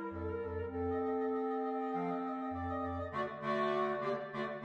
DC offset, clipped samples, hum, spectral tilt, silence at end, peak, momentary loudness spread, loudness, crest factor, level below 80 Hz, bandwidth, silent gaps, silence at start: under 0.1%; under 0.1%; none; -8 dB/octave; 0 s; -22 dBFS; 6 LU; -37 LUFS; 14 dB; -60 dBFS; 8 kHz; none; 0 s